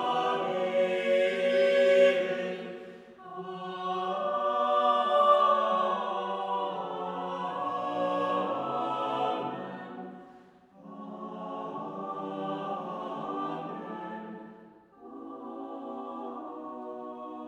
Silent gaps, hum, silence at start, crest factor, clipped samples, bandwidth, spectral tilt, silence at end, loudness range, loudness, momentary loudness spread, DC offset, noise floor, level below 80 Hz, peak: none; none; 0 s; 18 dB; under 0.1%; 9.4 kHz; -5.5 dB/octave; 0 s; 13 LU; -29 LUFS; 19 LU; under 0.1%; -55 dBFS; -80 dBFS; -12 dBFS